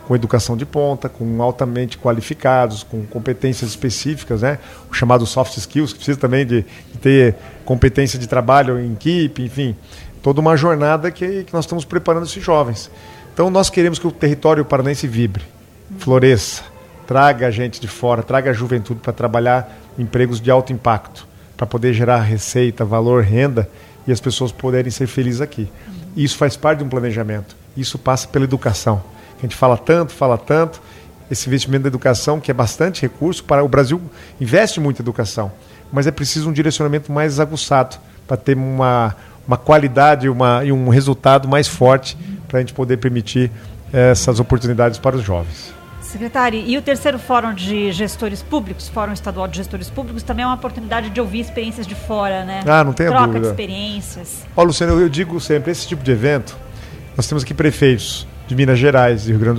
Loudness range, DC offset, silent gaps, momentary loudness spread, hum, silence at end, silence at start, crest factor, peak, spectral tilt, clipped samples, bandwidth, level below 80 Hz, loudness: 4 LU; under 0.1%; none; 12 LU; none; 0 s; 0 s; 16 dB; 0 dBFS; -6 dB/octave; under 0.1%; 15.5 kHz; -38 dBFS; -16 LUFS